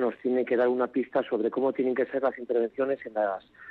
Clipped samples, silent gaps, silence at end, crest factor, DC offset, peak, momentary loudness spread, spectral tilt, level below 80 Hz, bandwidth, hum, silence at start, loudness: under 0.1%; none; 0 s; 12 dB; under 0.1%; -14 dBFS; 5 LU; -8.5 dB/octave; -74 dBFS; 4.5 kHz; none; 0 s; -28 LUFS